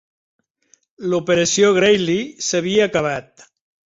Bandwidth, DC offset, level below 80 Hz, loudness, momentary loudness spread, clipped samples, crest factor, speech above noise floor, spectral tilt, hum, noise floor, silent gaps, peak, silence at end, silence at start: 8 kHz; under 0.1%; -56 dBFS; -17 LUFS; 10 LU; under 0.1%; 16 dB; 42 dB; -3.5 dB/octave; none; -59 dBFS; none; -2 dBFS; 0.65 s; 1 s